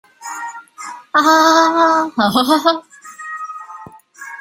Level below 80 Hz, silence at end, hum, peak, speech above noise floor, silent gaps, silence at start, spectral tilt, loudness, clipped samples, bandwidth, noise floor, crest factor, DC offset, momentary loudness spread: -62 dBFS; 0 s; none; 0 dBFS; 25 dB; none; 0.2 s; -3 dB/octave; -13 LUFS; under 0.1%; 16 kHz; -37 dBFS; 16 dB; under 0.1%; 22 LU